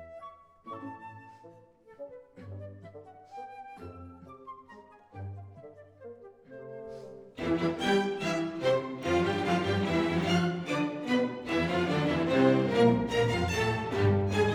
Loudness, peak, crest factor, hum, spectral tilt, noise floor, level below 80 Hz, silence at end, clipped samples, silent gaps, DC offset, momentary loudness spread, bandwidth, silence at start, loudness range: -28 LUFS; -10 dBFS; 20 dB; none; -6.5 dB/octave; -56 dBFS; -56 dBFS; 0 s; under 0.1%; none; under 0.1%; 24 LU; 15.5 kHz; 0 s; 20 LU